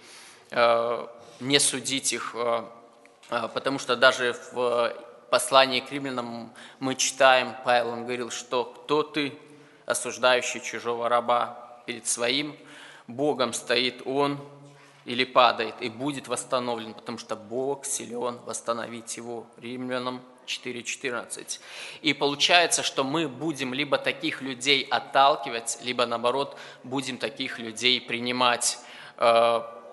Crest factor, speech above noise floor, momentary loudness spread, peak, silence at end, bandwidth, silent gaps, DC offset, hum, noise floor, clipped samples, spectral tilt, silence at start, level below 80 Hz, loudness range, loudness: 26 dB; 27 dB; 15 LU; 0 dBFS; 0 s; 11.5 kHz; none; under 0.1%; none; -53 dBFS; under 0.1%; -2 dB/octave; 0.05 s; -76 dBFS; 8 LU; -25 LUFS